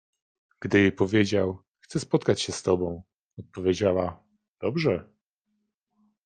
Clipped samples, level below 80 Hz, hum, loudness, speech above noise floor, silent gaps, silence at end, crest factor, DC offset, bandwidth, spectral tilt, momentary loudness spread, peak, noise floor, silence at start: under 0.1%; -62 dBFS; none; -26 LUFS; 53 dB; 1.68-1.75 s, 3.18-3.37 s, 4.48-4.55 s; 1.2 s; 20 dB; under 0.1%; 9.6 kHz; -5.5 dB/octave; 12 LU; -6 dBFS; -78 dBFS; 0.6 s